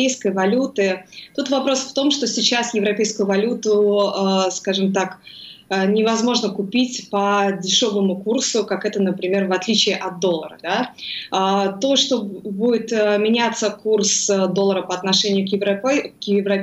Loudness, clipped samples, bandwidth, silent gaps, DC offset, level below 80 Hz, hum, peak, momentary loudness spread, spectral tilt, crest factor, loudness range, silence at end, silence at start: -19 LUFS; under 0.1%; 10.5 kHz; none; under 0.1%; -70 dBFS; none; -2 dBFS; 6 LU; -3.5 dB/octave; 16 dB; 2 LU; 0 s; 0 s